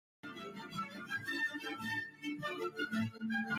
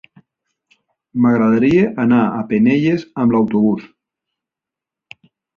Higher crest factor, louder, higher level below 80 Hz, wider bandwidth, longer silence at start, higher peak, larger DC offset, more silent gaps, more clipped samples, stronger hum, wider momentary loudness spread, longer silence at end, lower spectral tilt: about the same, 14 dB vs 16 dB; second, -40 LUFS vs -15 LUFS; second, -78 dBFS vs -54 dBFS; first, 16 kHz vs 6.8 kHz; second, 0.25 s vs 1.15 s; second, -26 dBFS vs -2 dBFS; neither; neither; neither; neither; first, 10 LU vs 5 LU; second, 0 s vs 1.7 s; second, -4.5 dB/octave vs -9 dB/octave